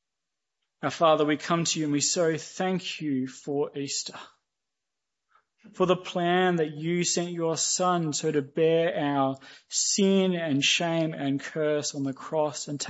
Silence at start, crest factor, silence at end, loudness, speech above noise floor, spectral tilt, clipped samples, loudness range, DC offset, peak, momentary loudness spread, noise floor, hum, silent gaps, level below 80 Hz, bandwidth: 0.85 s; 18 dB; 0 s; -26 LUFS; 60 dB; -4 dB/octave; under 0.1%; 7 LU; under 0.1%; -8 dBFS; 8 LU; -87 dBFS; none; none; -76 dBFS; 8.2 kHz